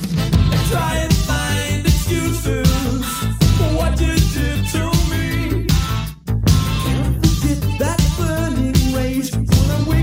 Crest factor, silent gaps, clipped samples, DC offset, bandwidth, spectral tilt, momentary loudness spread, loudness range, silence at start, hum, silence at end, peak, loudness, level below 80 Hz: 14 dB; none; under 0.1%; under 0.1%; 16 kHz; -5.5 dB/octave; 4 LU; 1 LU; 0 s; none; 0 s; -2 dBFS; -18 LUFS; -22 dBFS